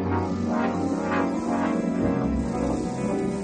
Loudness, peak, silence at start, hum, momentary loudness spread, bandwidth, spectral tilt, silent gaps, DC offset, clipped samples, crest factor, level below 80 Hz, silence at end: -26 LUFS; -14 dBFS; 0 s; none; 2 LU; 9.8 kHz; -7 dB/octave; none; under 0.1%; under 0.1%; 12 dB; -42 dBFS; 0 s